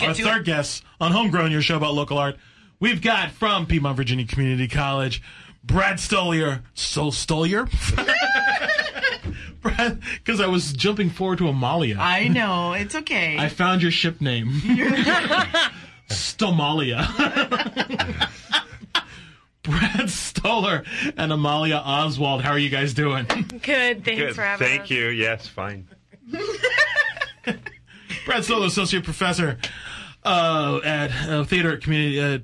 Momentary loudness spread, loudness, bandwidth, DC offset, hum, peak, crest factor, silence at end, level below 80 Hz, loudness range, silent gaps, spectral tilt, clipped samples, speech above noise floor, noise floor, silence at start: 9 LU; -21 LUFS; 12 kHz; under 0.1%; none; -6 dBFS; 16 dB; 0 s; -40 dBFS; 3 LU; none; -4.5 dB/octave; under 0.1%; 25 dB; -47 dBFS; 0 s